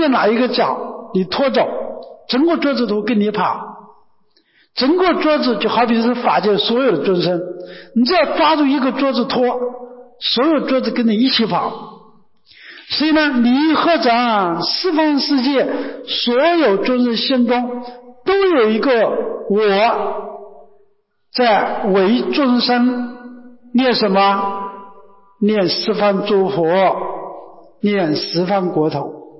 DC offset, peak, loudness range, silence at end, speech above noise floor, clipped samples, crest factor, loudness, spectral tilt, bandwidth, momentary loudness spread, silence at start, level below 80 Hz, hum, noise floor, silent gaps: under 0.1%; -4 dBFS; 3 LU; 0.1 s; 42 dB; under 0.1%; 12 dB; -16 LUFS; -8.5 dB/octave; 5.8 kHz; 12 LU; 0 s; -58 dBFS; none; -58 dBFS; none